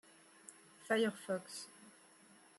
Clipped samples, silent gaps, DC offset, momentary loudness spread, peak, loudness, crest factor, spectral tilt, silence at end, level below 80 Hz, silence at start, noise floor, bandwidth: under 0.1%; none; under 0.1%; 23 LU; -22 dBFS; -39 LUFS; 22 dB; -4 dB/octave; 0.7 s; under -90 dBFS; 0.5 s; -64 dBFS; 12.5 kHz